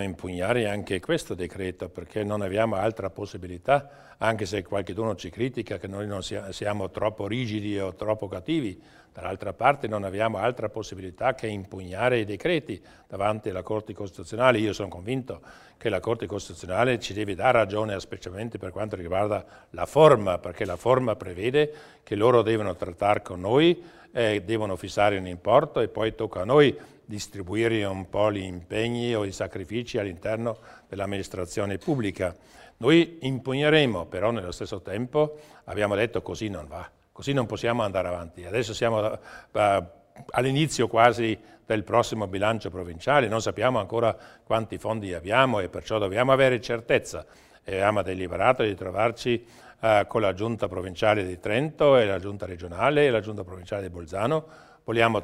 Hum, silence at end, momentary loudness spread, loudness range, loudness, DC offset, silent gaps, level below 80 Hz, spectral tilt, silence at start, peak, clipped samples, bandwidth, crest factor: none; 0 s; 14 LU; 5 LU; -26 LUFS; under 0.1%; none; -54 dBFS; -5.5 dB/octave; 0 s; -2 dBFS; under 0.1%; 15.5 kHz; 24 dB